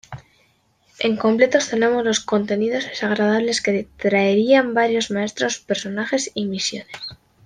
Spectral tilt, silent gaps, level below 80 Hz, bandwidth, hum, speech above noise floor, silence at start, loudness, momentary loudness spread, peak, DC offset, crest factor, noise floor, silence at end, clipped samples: -4 dB/octave; none; -60 dBFS; 10 kHz; none; 41 dB; 0.1 s; -20 LUFS; 9 LU; -2 dBFS; under 0.1%; 18 dB; -61 dBFS; 0.3 s; under 0.1%